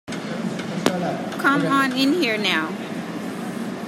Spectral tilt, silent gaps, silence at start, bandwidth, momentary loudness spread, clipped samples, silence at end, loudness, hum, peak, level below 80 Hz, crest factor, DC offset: -4.5 dB/octave; none; 0.05 s; 16 kHz; 11 LU; under 0.1%; 0 s; -22 LUFS; none; 0 dBFS; -66 dBFS; 22 dB; under 0.1%